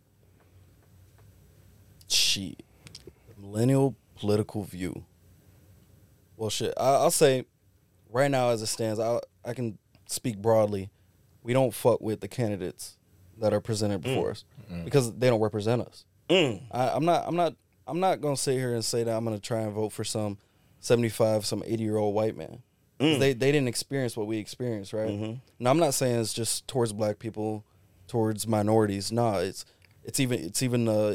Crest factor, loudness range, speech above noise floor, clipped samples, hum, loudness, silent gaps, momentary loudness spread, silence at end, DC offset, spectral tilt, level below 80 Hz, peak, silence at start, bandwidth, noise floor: 20 dB; 4 LU; 37 dB; under 0.1%; none; -27 LUFS; none; 13 LU; 0 s; under 0.1%; -5 dB/octave; -62 dBFS; -8 dBFS; 2.1 s; 18 kHz; -64 dBFS